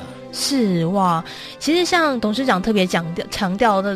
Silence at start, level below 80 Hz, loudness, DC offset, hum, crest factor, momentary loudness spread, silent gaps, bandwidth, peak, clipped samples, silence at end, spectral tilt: 0 s; -48 dBFS; -19 LUFS; under 0.1%; none; 16 dB; 8 LU; none; 14 kHz; -2 dBFS; under 0.1%; 0 s; -4.5 dB/octave